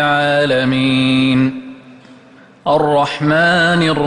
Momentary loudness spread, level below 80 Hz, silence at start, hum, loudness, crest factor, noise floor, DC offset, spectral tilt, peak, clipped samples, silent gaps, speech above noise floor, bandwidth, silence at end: 6 LU; -48 dBFS; 0 s; none; -14 LUFS; 12 dB; -43 dBFS; under 0.1%; -6 dB/octave; -2 dBFS; under 0.1%; none; 30 dB; 10.5 kHz; 0 s